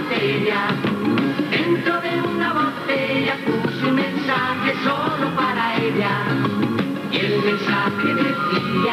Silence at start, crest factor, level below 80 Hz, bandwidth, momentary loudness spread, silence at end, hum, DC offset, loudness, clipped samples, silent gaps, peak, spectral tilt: 0 s; 14 dB; -62 dBFS; 15.5 kHz; 2 LU; 0 s; none; under 0.1%; -20 LUFS; under 0.1%; none; -6 dBFS; -6.5 dB/octave